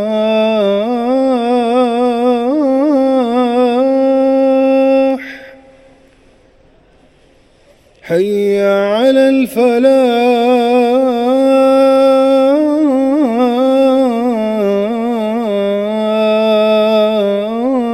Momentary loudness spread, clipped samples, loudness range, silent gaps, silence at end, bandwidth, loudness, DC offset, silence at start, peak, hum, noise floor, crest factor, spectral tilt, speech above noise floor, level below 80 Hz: 6 LU; under 0.1%; 7 LU; none; 0 s; 14 kHz; -12 LUFS; under 0.1%; 0 s; 0 dBFS; none; -48 dBFS; 12 dB; -6 dB/octave; 37 dB; -54 dBFS